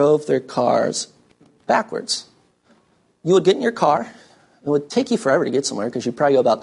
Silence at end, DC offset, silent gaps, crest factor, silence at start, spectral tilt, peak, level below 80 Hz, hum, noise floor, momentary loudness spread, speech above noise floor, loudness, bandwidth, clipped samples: 0 s; under 0.1%; none; 16 dB; 0 s; -4.5 dB/octave; -4 dBFS; -66 dBFS; none; -60 dBFS; 10 LU; 41 dB; -20 LUFS; 11.5 kHz; under 0.1%